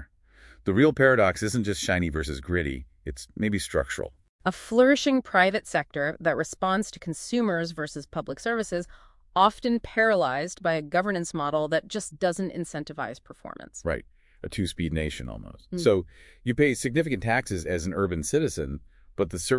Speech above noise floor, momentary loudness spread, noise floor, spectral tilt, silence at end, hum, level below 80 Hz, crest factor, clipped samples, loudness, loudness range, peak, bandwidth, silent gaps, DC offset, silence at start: 28 dB; 14 LU; -54 dBFS; -5 dB/octave; 0 s; none; -48 dBFS; 22 dB; under 0.1%; -26 LUFS; 6 LU; -4 dBFS; 12 kHz; 4.29-4.39 s; under 0.1%; 0 s